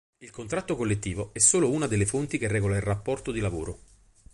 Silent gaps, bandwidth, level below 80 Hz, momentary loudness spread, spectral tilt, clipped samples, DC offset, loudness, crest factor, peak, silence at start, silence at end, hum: none; 11.5 kHz; -46 dBFS; 16 LU; -4.5 dB/octave; under 0.1%; under 0.1%; -26 LUFS; 22 dB; -6 dBFS; 0.2 s; 0.55 s; none